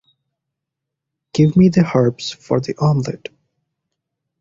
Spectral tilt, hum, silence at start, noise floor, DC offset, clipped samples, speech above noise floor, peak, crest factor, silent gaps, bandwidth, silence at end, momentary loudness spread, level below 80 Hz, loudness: -7.5 dB/octave; none; 1.35 s; -81 dBFS; under 0.1%; under 0.1%; 66 dB; -2 dBFS; 16 dB; none; 7.6 kHz; 1.25 s; 15 LU; -50 dBFS; -16 LUFS